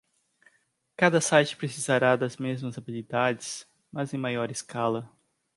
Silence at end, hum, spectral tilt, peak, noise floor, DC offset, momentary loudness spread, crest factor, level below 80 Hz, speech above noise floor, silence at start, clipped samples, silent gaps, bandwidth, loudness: 0.5 s; none; -4.5 dB/octave; -6 dBFS; -70 dBFS; under 0.1%; 14 LU; 22 dB; -72 dBFS; 44 dB; 1 s; under 0.1%; none; 11.5 kHz; -27 LUFS